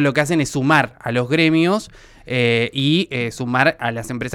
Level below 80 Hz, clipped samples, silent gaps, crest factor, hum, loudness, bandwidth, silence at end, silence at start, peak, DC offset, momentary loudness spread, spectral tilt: -50 dBFS; under 0.1%; none; 16 dB; none; -18 LUFS; 16 kHz; 0 s; 0 s; -2 dBFS; under 0.1%; 8 LU; -5.5 dB/octave